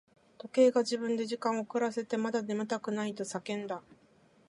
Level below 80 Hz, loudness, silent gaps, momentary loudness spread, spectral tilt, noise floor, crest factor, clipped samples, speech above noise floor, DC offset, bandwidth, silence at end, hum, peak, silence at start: -82 dBFS; -32 LUFS; none; 12 LU; -4.5 dB/octave; -64 dBFS; 20 dB; under 0.1%; 33 dB; under 0.1%; 11.5 kHz; 0.7 s; none; -12 dBFS; 0.45 s